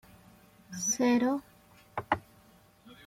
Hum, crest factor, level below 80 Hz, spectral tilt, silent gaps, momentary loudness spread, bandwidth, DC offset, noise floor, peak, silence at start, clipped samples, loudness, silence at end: none; 22 dB; -66 dBFS; -3.5 dB/octave; none; 16 LU; 16 kHz; under 0.1%; -60 dBFS; -10 dBFS; 0.7 s; under 0.1%; -31 LUFS; 0.15 s